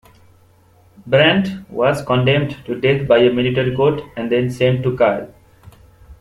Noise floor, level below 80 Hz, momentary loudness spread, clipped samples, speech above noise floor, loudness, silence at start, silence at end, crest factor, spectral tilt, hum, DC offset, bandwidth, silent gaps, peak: -51 dBFS; -48 dBFS; 10 LU; under 0.1%; 35 dB; -16 LUFS; 1.05 s; 0.05 s; 18 dB; -7 dB/octave; none; under 0.1%; 12.5 kHz; none; 0 dBFS